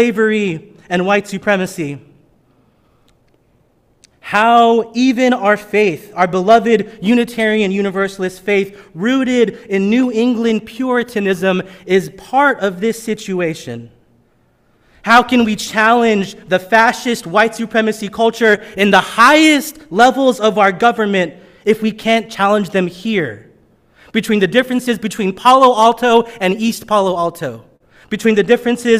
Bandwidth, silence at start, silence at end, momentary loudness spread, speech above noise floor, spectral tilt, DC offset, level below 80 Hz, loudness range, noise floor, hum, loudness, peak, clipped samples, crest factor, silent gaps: 16 kHz; 0 s; 0 s; 11 LU; 42 dB; -5 dB/octave; under 0.1%; -54 dBFS; 6 LU; -56 dBFS; none; -14 LUFS; 0 dBFS; under 0.1%; 14 dB; none